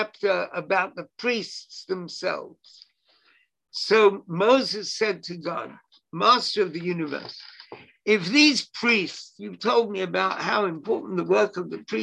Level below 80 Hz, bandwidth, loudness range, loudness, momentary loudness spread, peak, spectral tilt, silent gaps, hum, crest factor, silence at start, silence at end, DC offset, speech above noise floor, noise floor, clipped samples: -74 dBFS; 10.5 kHz; 6 LU; -24 LUFS; 17 LU; -6 dBFS; -4 dB/octave; none; none; 20 dB; 0 s; 0 s; under 0.1%; 40 dB; -64 dBFS; under 0.1%